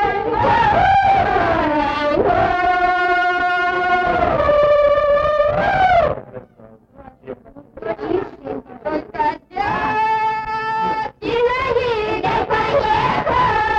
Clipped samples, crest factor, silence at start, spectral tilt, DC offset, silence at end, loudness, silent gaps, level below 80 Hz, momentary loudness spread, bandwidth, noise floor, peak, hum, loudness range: under 0.1%; 12 dB; 0 s; -6.5 dB/octave; under 0.1%; 0 s; -17 LUFS; none; -38 dBFS; 12 LU; 8 kHz; -45 dBFS; -6 dBFS; none; 8 LU